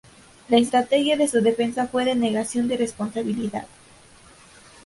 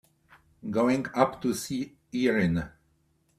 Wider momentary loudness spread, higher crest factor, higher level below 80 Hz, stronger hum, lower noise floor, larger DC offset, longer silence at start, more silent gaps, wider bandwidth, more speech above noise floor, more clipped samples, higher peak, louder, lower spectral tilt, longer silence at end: about the same, 8 LU vs 10 LU; second, 18 dB vs 24 dB; about the same, -60 dBFS vs -58 dBFS; neither; second, -50 dBFS vs -69 dBFS; neither; second, 0.5 s vs 0.65 s; neither; second, 11.5 kHz vs 15 kHz; second, 29 dB vs 42 dB; neither; about the same, -6 dBFS vs -6 dBFS; first, -22 LUFS vs -28 LUFS; second, -4.5 dB/octave vs -6 dB/octave; first, 1.2 s vs 0.7 s